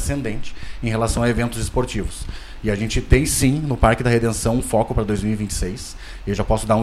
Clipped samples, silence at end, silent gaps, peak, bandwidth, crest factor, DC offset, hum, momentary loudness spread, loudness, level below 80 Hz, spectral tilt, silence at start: under 0.1%; 0 s; none; -2 dBFS; 15.5 kHz; 18 dB; under 0.1%; none; 14 LU; -21 LUFS; -28 dBFS; -5.5 dB/octave; 0 s